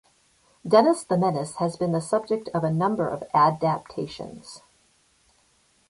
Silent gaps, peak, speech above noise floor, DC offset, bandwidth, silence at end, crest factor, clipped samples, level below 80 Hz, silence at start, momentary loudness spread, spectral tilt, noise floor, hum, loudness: none; -4 dBFS; 40 dB; under 0.1%; 11.5 kHz; 1.3 s; 20 dB; under 0.1%; -62 dBFS; 0.65 s; 18 LU; -6.5 dB/octave; -64 dBFS; none; -24 LUFS